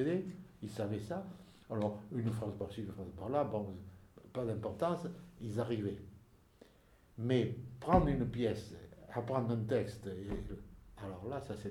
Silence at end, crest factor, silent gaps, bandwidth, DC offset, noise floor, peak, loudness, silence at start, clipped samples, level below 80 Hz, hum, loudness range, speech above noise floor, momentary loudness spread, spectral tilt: 0 s; 24 dB; none; 13.5 kHz; under 0.1%; -65 dBFS; -14 dBFS; -39 LUFS; 0 s; under 0.1%; -54 dBFS; none; 5 LU; 28 dB; 16 LU; -8 dB/octave